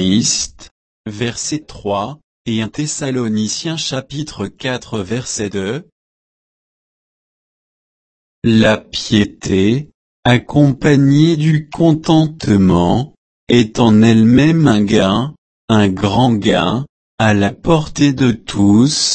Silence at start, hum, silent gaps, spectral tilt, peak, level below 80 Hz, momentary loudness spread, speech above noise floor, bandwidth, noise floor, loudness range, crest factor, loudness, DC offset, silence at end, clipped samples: 0 s; none; 0.71-1.04 s, 2.24-2.45 s, 5.92-8.42 s, 9.94-10.23 s, 13.17-13.47 s, 15.38-15.68 s, 16.89-17.18 s; -5.5 dB/octave; 0 dBFS; -40 dBFS; 12 LU; over 77 dB; 8.8 kHz; under -90 dBFS; 11 LU; 14 dB; -14 LUFS; under 0.1%; 0 s; under 0.1%